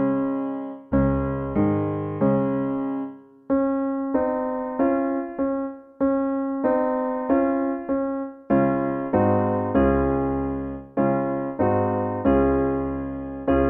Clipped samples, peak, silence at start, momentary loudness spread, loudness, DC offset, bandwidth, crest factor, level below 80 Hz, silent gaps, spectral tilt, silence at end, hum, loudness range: under 0.1%; -6 dBFS; 0 s; 8 LU; -24 LUFS; under 0.1%; 3.3 kHz; 16 dB; -40 dBFS; none; -12.5 dB/octave; 0 s; none; 2 LU